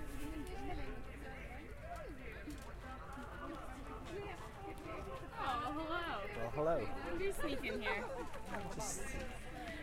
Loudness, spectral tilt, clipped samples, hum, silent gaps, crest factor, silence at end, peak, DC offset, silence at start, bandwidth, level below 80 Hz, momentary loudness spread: -44 LUFS; -4.5 dB/octave; under 0.1%; none; none; 18 dB; 0 s; -26 dBFS; under 0.1%; 0 s; 16.5 kHz; -52 dBFS; 10 LU